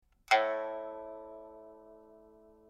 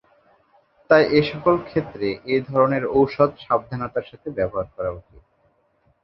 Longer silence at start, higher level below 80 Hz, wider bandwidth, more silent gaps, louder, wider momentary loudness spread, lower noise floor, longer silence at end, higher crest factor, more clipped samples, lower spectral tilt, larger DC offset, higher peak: second, 0.3 s vs 0.9 s; second, -72 dBFS vs -52 dBFS; first, 13.5 kHz vs 6 kHz; neither; second, -32 LUFS vs -21 LUFS; first, 25 LU vs 12 LU; second, -59 dBFS vs -64 dBFS; second, 0.5 s vs 1.05 s; first, 26 dB vs 20 dB; neither; second, -1 dB/octave vs -8.5 dB/octave; neither; second, -12 dBFS vs -2 dBFS